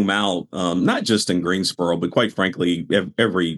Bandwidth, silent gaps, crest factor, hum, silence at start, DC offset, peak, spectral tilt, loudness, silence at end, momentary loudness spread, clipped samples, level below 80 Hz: 13.5 kHz; none; 18 dB; none; 0 s; under 0.1%; -4 dBFS; -4.5 dB/octave; -20 LUFS; 0 s; 3 LU; under 0.1%; -60 dBFS